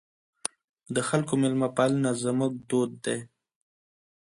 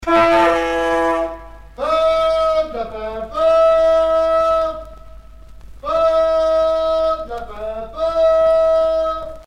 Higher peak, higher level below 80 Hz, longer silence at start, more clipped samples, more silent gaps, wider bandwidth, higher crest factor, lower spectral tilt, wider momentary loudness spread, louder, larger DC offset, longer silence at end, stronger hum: about the same, -6 dBFS vs -4 dBFS; second, -70 dBFS vs -40 dBFS; first, 0.45 s vs 0 s; neither; first, 0.69-0.74 s vs none; about the same, 11.5 kHz vs 10.5 kHz; first, 24 dB vs 14 dB; about the same, -5.5 dB/octave vs -5 dB/octave; about the same, 12 LU vs 14 LU; second, -28 LUFS vs -16 LUFS; neither; first, 1.05 s vs 0.05 s; neither